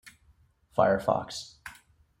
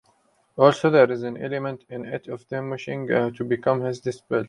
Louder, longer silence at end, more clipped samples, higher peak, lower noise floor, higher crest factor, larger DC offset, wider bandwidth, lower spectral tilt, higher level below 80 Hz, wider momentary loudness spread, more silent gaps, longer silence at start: second, -28 LUFS vs -23 LUFS; first, 0.45 s vs 0 s; neither; second, -10 dBFS vs -2 dBFS; about the same, -64 dBFS vs -64 dBFS; about the same, 20 dB vs 22 dB; neither; first, 16.5 kHz vs 11 kHz; second, -5 dB/octave vs -7 dB/octave; about the same, -62 dBFS vs -66 dBFS; first, 22 LU vs 15 LU; neither; second, 0.05 s vs 0.55 s